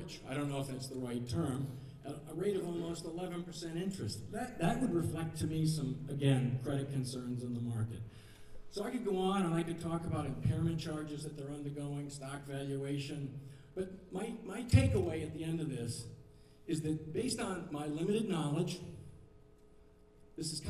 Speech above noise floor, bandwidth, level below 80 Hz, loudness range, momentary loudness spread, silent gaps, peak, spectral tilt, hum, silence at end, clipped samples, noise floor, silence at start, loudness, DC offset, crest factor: 24 dB; 15 kHz; -56 dBFS; 4 LU; 12 LU; none; -14 dBFS; -6.5 dB/octave; none; 0 s; under 0.1%; -61 dBFS; 0 s; -38 LUFS; under 0.1%; 24 dB